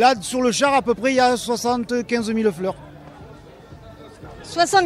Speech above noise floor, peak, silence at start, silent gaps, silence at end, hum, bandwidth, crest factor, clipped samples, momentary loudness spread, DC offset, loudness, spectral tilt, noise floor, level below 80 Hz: 23 dB; -2 dBFS; 0 s; none; 0 s; none; 15 kHz; 18 dB; under 0.1%; 24 LU; under 0.1%; -20 LUFS; -3.5 dB/octave; -42 dBFS; -52 dBFS